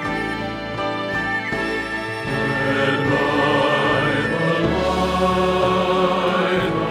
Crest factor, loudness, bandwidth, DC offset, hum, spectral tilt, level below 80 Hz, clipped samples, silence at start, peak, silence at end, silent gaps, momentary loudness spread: 14 dB; -20 LUFS; 15 kHz; under 0.1%; none; -6 dB/octave; -40 dBFS; under 0.1%; 0 s; -6 dBFS; 0 s; none; 7 LU